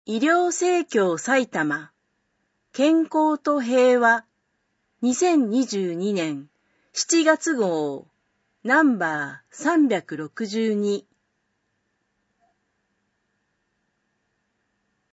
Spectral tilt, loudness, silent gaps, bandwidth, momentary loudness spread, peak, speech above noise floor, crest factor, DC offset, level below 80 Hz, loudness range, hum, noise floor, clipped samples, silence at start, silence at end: -4 dB/octave; -22 LUFS; none; 8.2 kHz; 12 LU; -6 dBFS; 52 dB; 18 dB; under 0.1%; -78 dBFS; 7 LU; none; -74 dBFS; under 0.1%; 0.1 s; 4.15 s